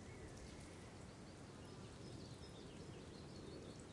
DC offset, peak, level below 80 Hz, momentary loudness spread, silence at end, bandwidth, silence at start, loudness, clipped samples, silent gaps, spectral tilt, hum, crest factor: under 0.1%; -42 dBFS; -66 dBFS; 2 LU; 0 s; 11.5 kHz; 0 s; -56 LUFS; under 0.1%; none; -5 dB/octave; none; 12 dB